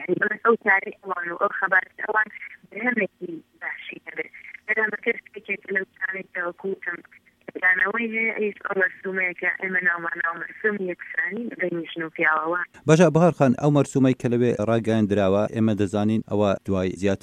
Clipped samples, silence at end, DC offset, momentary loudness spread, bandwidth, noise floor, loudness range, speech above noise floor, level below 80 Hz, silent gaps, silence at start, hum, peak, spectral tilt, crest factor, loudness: under 0.1%; 0.05 s; under 0.1%; 13 LU; 11 kHz; -51 dBFS; 7 LU; 29 dB; -62 dBFS; none; 0 s; none; -4 dBFS; -6.5 dB/octave; 20 dB; -23 LUFS